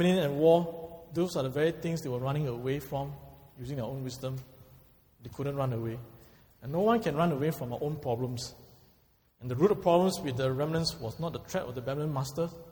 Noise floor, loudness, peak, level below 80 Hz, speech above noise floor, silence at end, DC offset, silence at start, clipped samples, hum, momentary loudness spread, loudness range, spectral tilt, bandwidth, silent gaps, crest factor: -66 dBFS; -31 LUFS; -12 dBFS; -58 dBFS; 36 dB; 0 s; under 0.1%; 0 s; under 0.1%; none; 16 LU; 8 LU; -6.5 dB/octave; over 20 kHz; none; 18 dB